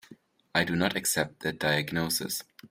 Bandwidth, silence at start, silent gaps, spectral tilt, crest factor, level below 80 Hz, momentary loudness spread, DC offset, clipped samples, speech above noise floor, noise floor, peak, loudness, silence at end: 16 kHz; 0.1 s; none; -3.5 dB/octave; 20 dB; -62 dBFS; 6 LU; under 0.1%; under 0.1%; 26 dB; -56 dBFS; -10 dBFS; -28 LUFS; 0.05 s